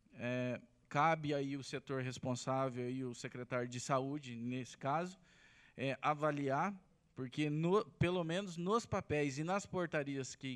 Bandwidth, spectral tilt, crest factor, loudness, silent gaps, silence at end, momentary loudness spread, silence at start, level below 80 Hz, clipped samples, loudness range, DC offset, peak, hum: 11.5 kHz; -5.5 dB/octave; 20 dB; -39 LUFS; none; 0 s; 9 LU; 0.15 s; -70 dBFS; under 0.1%; 3 LU; under 0.1%; -20 dBFS; none